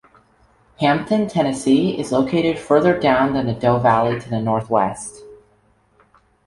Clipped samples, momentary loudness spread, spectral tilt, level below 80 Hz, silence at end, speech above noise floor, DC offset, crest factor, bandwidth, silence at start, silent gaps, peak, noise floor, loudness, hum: under 0.1%; 5 LU; -6 dB/octave; -50 dBFS; 1.1 s; 41 dB; under 0.1%; 16 dB; 11.5 kHz; 0.8 s; none; -2 dBFS; -58 dBFS; -18 LUFS; none